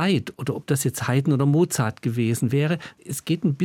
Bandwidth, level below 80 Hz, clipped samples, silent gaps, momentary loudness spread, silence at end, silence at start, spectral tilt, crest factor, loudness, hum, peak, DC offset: 17.5 kHz; -64 dBFS; under 0.1%; none; 10 LU; 0 s; 0 s; -6 dB/octave; 16 dB; -23 LUFS; none; -8 dBFS; under 0.1%